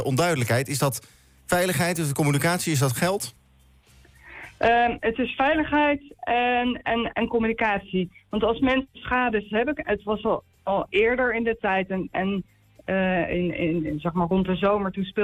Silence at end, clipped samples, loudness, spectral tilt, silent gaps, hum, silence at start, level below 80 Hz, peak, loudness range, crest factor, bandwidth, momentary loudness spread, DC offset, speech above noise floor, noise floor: 0 s; under 0.1%; -24 LUFS; -5 dB/octave; none; none; 0 s; -48 dBFS; -10 dBFS; 2 LU; 14 dB; 17 kHz; 7 LU; under 0.1%; 33 dB; -57 dBFS